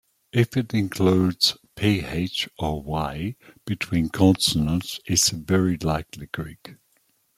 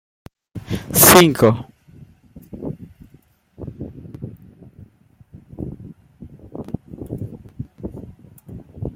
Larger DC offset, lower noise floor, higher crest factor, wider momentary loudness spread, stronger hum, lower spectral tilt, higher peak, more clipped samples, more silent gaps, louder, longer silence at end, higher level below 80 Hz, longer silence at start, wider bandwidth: neither; first, -66 dBFS vs -53 dBFS; about the same, 18 dB vs 22 dB; second, 13 LU vs 29 LU; neither; about the same, -4.5 dB/octave vs -3.5 dB/octave; second, -6 dBFS vs 0 dBFS; neither; neither; second, -23 LUFS vs -13 LUFS; first, 0.65 s vs 0.05 s; about the same, -46 dBFS vs -46 dBFS; second, 0.35 s vs 0.55 s; about the same, 16 kHz vs 16.5 kHz